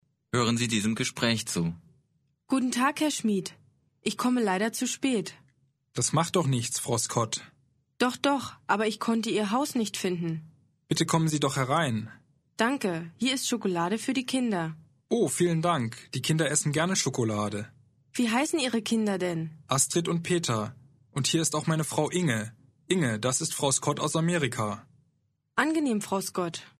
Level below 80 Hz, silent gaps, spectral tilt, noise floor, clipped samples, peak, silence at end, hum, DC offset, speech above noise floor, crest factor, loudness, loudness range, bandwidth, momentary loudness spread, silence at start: -66 dBFS; none; -4 dB/octave; -73 dBFS; under 0.1%; -8 dBFS; 0.15 s; none; under 0.1%; 45 dB; 20 dB; -28 LUFS; 2 LU; 13 kHz; 8 LU; 0.35 s